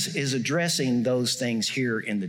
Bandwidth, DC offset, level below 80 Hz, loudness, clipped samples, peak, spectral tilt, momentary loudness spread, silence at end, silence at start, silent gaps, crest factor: 18 kHz; under 0.1%; -72 dBFS; -25 LUFS; under 0.1%; -14 dBFS; -4 dB/octave; 3 LU; 0 s; 0 s; none; 12 dB